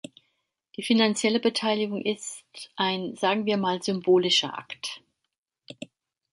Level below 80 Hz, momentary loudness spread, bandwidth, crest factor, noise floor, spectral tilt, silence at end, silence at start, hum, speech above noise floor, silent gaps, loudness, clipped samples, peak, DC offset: -74 dBFS; 21 LU; 11.5 kHz; 18 dB; -76 dBFS; -4 dB/octave; 0.45 s; 0.8 s; none; 51 dB; 5.37-5.44 s; -25 LUFS; under 0.1%; -10 dBFS; under 0.1%